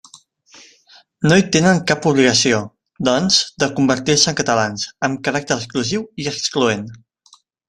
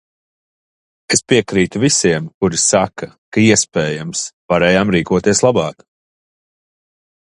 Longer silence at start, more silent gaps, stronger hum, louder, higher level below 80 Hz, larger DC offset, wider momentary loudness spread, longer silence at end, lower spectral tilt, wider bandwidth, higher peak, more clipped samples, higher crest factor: second, 0.15 s vs 1.1 s; second, none vs 2.34-2.41 s, 3.18-3.32 s, 4.33-4.49 s; neither; about the same, -17 LUFS vs -15 LUFS; second, -52 dBFS vs -46 dBFS; neither; about the same, 9 LU vs 9 LU; second, 0.75 s vs 1.55 s; about the same, -3.5 dB/octave vs -4 dB/octave; about the same, 12 kHz vs 11.5 kHz; about the same, 0 dBFS vs 0 dBFS; neither; about the same, 18 dB vs 16 dB